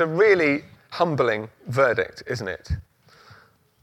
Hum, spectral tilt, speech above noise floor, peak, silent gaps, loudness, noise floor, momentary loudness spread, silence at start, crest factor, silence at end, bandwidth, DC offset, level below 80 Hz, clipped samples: none; -6.5 dB/octave; 33 dB; -6 dBFS; none; -23 LUFS; -55 dBFS; 14 LU; 0 s; 18 dB; 1 s; 13 kHz; under 0.1%; -46 dBFS; under 0.1%